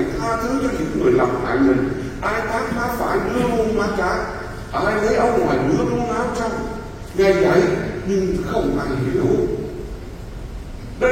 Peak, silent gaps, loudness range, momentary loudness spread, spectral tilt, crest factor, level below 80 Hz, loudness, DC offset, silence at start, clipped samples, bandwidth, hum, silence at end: -2 dBFS; none; 2 LU; 14 LU; -6.5 dB/octave; 18 dB; -34 dBFS; -20 LUFS; under 0.1%; 0 s; under 0.1%; 16.5 kHz; none; 0 s